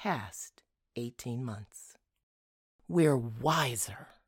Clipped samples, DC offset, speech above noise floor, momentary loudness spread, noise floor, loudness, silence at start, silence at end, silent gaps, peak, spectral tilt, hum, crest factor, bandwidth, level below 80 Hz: under 0.1%; under 0.1%; over 58 dB; 19 LU; under -90 dBFS; -32 LUFS; 0 s; 0.2 s; 2.23-2.79 s; -14 dBFS; -5 dB/octave; none; 20 dB; 18 kHz; -66 dBFS